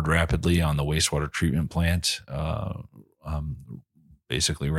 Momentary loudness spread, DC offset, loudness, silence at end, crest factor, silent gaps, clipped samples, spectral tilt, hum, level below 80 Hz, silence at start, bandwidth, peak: 16 LU; under 0.1%; -26 LUFS; 0 s; 18 dB; none; under 0.1%; -4.5 dB/octave; none; -36 dBFS; 0 s; 16 kHz; -8 dBFS